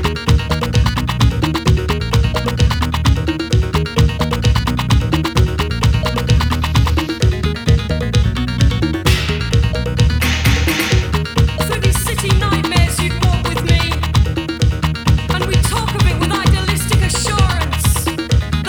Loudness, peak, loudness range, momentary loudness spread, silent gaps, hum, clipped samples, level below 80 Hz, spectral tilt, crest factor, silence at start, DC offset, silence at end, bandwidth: -16 LUFS; 0 dBFS; 1 LU; 2 LU; none; none; under 0.1%; -20 dBFS; -5 dB/octave; 14 dB; 0 s; under 0.1%; 0 s; 18 kHz